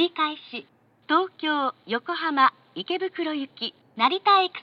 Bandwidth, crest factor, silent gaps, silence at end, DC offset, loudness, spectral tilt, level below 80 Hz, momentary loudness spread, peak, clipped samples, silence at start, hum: 6.2 kHz; 20 dB; none; 0 s; under 0.1%; -24 LUFS; -5 dB/octave; -86 dBFS; 13 LU; -6 dBFS; under 0.1%; 0 s; none